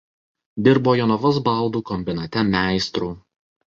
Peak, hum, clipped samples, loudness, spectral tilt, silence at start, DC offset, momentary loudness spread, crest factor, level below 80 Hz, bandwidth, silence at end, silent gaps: -2 dBFS; none; under 0.1%; -20 LUFS; -6.5 dB/octave; 0.55 s; under 0.1%; 11 LU; 18 dB; -48 dBFS; 7.8 kHz; 0.5 s; none